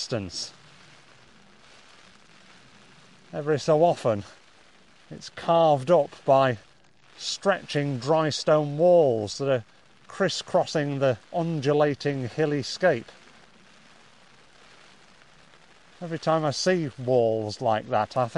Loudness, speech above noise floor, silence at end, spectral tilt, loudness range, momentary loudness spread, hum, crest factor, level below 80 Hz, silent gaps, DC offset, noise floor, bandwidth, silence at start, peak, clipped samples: -25 LUFS; 34 dB; 0 s; -5.5 dB/octave; 9 LU; 13 LU; none; 18 dB; -66 dBFS; none; 0.1%; -58 dBFS; 11.5 kHz; 0 s; -8 dBFS; under 0.1%